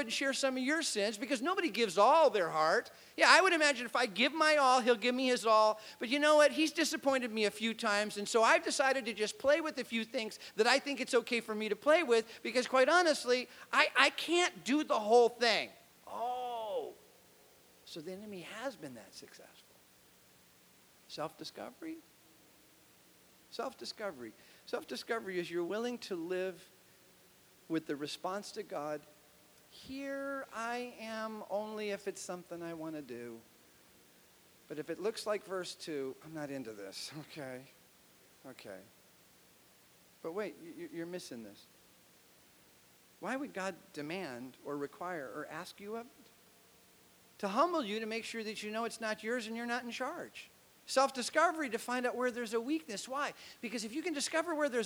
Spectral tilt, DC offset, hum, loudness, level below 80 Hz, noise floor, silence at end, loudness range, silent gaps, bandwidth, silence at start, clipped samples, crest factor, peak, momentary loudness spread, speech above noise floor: -2.5 dB/octave; under 0.1%; none; -33 LUFS; -82 dBFS; -64 dBFS; 0 s; 19 LU; none; over 20 kHz; 0 s; under 0.1%; 28 dB; -8 dBFS; 19 LU; 30 dB